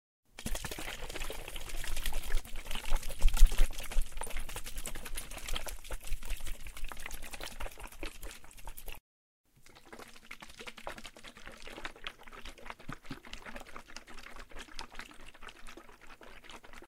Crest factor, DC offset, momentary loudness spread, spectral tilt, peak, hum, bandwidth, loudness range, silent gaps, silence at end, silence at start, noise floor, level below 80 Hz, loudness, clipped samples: 24 dB; under 0.1%; 12 LU; -3 dB/octave; -8 dBFS; none; 16 kHz; 12 LU; 9.00-9.44 s; 0 s; 0.4 s; -55 dBFS; -34 dBFS; -42 LUFS; under 0.1%